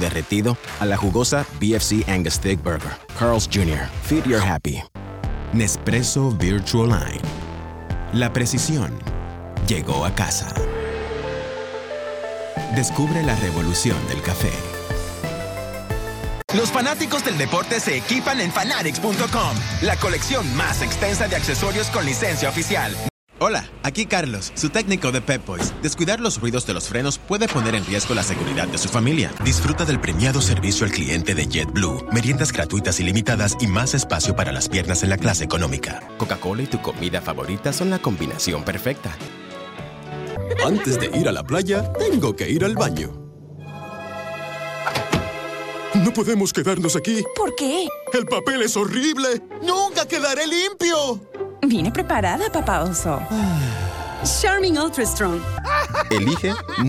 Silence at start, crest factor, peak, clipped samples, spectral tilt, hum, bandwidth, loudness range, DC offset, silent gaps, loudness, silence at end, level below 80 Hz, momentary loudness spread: 0 s; 18 dB; -4 dBFS; under 0.1%; -4.5 dB/octave; none; 19 kHz; 4 LU; under 0.1%; 16.44-16.48 s, 23.10-23.27 s; -21 LUFS; 0 s; -36 dBFS; 10 LU